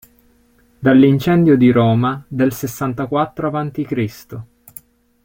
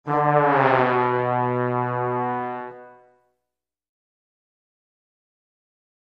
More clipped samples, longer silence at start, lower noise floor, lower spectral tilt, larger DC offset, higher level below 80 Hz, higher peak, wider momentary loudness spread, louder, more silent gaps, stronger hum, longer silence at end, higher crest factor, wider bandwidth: neither; first, 0.8 s vs 0.05 s; second, -54 dBFS vs -85 dBFS; second, -7.5 dB/octave vs -9 dB/octave; neither; first, -50 dBFS vs -64 dBFS; about the same, -2 dBFS vs -2 dBFS; about the same, 14 LU vs 12 LU; first, -16 LUFS vs -21 LUFS; neither; second, none vs 60 Hz at -80 dBFS; second, 0.8 s vs 3.25 s; second, 14 dB vs 22 dB; first, 17 kHz vs 6.2 kHz